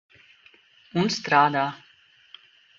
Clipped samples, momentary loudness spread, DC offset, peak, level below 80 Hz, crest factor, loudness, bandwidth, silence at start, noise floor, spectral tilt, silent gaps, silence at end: under 0.1%; 11 LU; under 0.1%; -4 dBFS; -68 dBFS; 22 dB; -23 LUFS; 7.6 kHz; 0.95 s; -58 dBFS; -4.5 dB/octave; none; 1.05 s